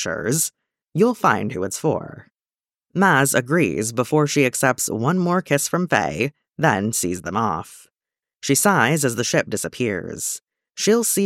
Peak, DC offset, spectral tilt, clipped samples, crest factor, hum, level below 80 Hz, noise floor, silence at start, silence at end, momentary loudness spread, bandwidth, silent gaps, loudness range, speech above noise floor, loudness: -2 dBFS; under 0.1%; -4 dB/octave; under 0.1%; 18 dB; none; -58 dBFS; under -90 dBFS; 0 s; 0 s; 9 LU; 17 kHz; none; 3 LU; over 70 dB; -20 LUFS